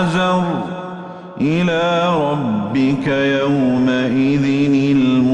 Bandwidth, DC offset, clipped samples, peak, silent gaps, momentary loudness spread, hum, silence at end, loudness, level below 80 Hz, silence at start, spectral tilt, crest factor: 9 kHz; under 0.1%; under 0.1%; -6 dBFS; none; 9 LU; none; 0 s; -16 LUFS; -50 dBFS; 0 s; -7 dB/octave; 10 dB